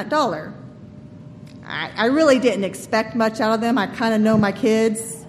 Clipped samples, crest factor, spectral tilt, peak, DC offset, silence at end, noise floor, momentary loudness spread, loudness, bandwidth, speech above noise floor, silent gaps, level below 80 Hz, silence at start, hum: under 0.1%; 16 dB; -5 dB/octave; -4 dBFS; under 0.1%; 0 s; -40 dBFS; 22 LU; -19 LUFS; 14.5 kHz; 21 dB; none; -56 dBFS; 0 s; none